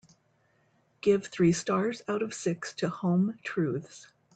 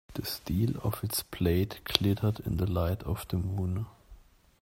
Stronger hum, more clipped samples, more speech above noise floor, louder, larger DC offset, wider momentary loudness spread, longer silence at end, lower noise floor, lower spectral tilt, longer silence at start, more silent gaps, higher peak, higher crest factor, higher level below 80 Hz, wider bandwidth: neither; neither; first, 41 dB vs 25 dB; about the same, -29 LUFS vs -31 LUFS; neither; about the same, 7 LU vs 7 LU; second, 0.3 s vs 0.45 s; first, -69 dBFS vs -55 dBFS; about the same, -6 dB/octave vs -5.5 dB/octave; first, 1.05 s vs 0.1 s; neither; second, -14 dBFS vs -2 dBFS; second, 18 dB vs 30 dB; second, -68 dBFS vs -48 dBFS; second, 9.2 kHz vs 16.5 kHz